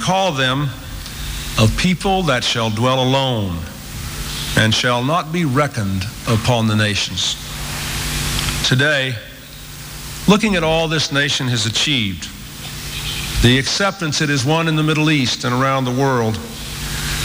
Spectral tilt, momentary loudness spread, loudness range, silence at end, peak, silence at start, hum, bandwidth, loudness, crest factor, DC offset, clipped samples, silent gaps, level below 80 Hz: -4 dB/octave; 13 LU; 2 LU; 0 s; 0 dBFS; 0 s; none; 16.5 kHz; -17 LUFS; 18 dB; under 0.1%; under 0.1%; none; -34 dBFS